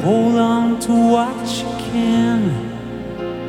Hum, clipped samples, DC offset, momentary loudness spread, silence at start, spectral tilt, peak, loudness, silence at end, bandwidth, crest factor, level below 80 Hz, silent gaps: none; under 0.1%; under 0.1%; 12 LU; 0 s; -6 dB/octave; -2 dBFS; -17 LUFS; 0 s; 14.5 kHz; 14 dB; -44 dBFS; none